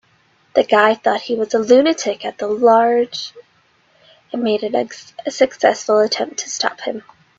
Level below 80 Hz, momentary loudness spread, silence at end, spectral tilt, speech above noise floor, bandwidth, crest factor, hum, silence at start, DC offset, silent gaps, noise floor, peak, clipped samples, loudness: -64 dBFS; 14 LU; 0.4 s; -3 dB/octave; 41 dB; 7.8 kHz; 18 dB; none; 0.55 s; under 0.1%; none; -57 dBFS; 0 dBFS; under 0.1%; -17 LUFS